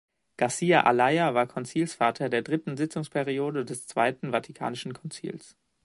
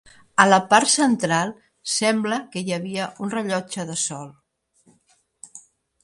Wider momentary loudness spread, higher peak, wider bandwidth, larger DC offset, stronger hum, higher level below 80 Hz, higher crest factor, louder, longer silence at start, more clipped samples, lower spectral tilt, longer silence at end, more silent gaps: second, 15 LU vs 20 LU; second, -4 dBFS vs 0 dBFS; about the same, 11.5 kHz vs 11.5 kHz; neither; neither; second, -72 dBFS vs -66 dBFS; about the same, 22 dB vs 22 dB; second, -27 LUFS vs -21 LUFS; about the same, 0.4 s vs 0.4 s; neither; first, -5 dB/octave vs -3 dB/octave; about the same, 0.4 s vs 0.45 s; neither